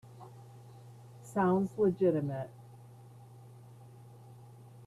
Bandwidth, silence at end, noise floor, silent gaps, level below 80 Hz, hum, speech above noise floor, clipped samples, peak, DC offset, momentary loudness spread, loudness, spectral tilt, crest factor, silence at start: 13 kHz; 0 s; -54 dBFS; none; -72 dBFS; none; 24 dB; under 0.1%; -18 dBFS; under 0.1%; 25 LU; -31 LUFS; -8.5 dB/octave; 18 dB; 0.1 s